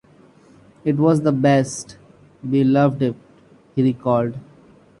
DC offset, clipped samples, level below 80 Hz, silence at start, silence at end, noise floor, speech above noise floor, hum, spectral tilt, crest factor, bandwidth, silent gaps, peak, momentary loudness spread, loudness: under 0.1%; under 0.1%; -58 dBFS; 0.85 s; 0.55 s; -51 dBFS; 33 dB; none; -7 dB/octave; 16 dB; 11.5 kHz; none; -4 dBFS; 17 LU; -19 LUFS